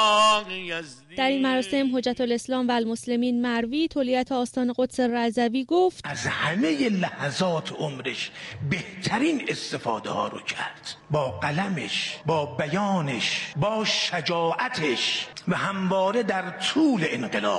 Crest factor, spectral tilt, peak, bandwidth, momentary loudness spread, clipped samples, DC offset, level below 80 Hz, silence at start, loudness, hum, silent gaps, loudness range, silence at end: 16 dB; -4.5 dB/octave; -10 dBFS; 11.5 kHz; 7 LU; under 0.1%; under 0.1%; -62 dBFS; 0 s; -25 LUFS; none; none; 3 LU; 0 s